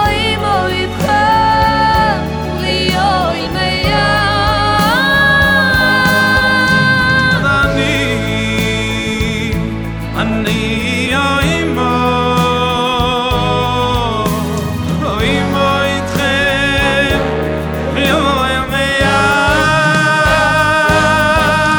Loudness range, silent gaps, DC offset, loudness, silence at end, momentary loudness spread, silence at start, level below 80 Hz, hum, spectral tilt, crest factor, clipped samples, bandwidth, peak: 5 LU; none; under 0.1%; -12 LUFS; 0 s; 7 LU; 0 s; -28 dBFS; none; -4.5 dB/octave; 12 dB; under 0.1%; over 20 kHz; 0 dBFS